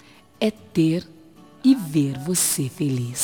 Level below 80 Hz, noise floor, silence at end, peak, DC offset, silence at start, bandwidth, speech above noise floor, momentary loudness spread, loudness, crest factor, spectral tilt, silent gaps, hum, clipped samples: -60 dBFS; -48 dBFS; 0 s; -6 dBFS; 0.1%; 0.4 s; 19.5 kHz; 27 dB; 6 LU; -22 LUFS; 16 dB; -5 dB/octave; none; none; under 0.1%